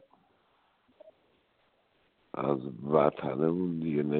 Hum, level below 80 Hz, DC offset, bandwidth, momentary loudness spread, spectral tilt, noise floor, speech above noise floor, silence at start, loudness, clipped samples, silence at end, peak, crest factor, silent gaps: none; -68 dBFS; under 0.1%; 4.4 kHz; 8 LU; -7.5 dB/octave; -71 dBFS; 42 dB; 1.05 s; -30 LUFS; under 0.1%; 0 s; -8 dBFS; 24 dB; none